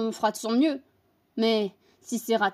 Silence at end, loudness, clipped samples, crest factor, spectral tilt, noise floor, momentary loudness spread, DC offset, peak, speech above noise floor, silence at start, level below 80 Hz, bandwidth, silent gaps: 0 s; -27 LUFS; under 0.1%; 16 dB; -4 dB/octave; -67 dBFS; 11 LU; under 0.1%; -10 dBFS; 41 dB; 0 s; -82 dBFS; 15.5 kHz; none